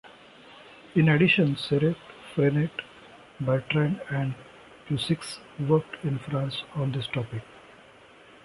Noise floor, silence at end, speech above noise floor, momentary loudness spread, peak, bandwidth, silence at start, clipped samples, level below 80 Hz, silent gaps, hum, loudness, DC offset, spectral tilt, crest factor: -52 dBFS; 0.85 s; 27 dB; 17 LU; -8 dBFS; 11.5 kHz; 0.05 s; under 0.1%; -60 dBFS; none; none; -26 LUFS; under 0.1%; -7 dB/octave; 20 dB